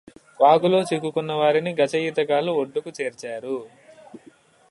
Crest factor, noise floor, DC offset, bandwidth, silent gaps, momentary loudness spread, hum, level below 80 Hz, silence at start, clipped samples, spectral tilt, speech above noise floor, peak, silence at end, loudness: 20 dB; -53 dBFS; under 0.1%; 11.5 kHz; none; 13 LU; none; -72 dBFS; 0.4 s; under 0.1%; -5.5 dB/octave; 32 dB; -4 dBFS; 0.55 s; -22 LUFS